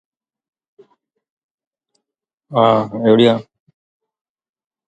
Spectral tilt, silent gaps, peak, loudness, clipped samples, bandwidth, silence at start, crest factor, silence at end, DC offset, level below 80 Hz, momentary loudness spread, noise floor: -7.5 dB/octave; none; 0 dBFS; -15 LUFS; under 0.1%; 8.8 kHz; 2.5 s; 20 dB; 1.45 s; under 0.1%; -62 dBFS; 10 LU; -82 dBFS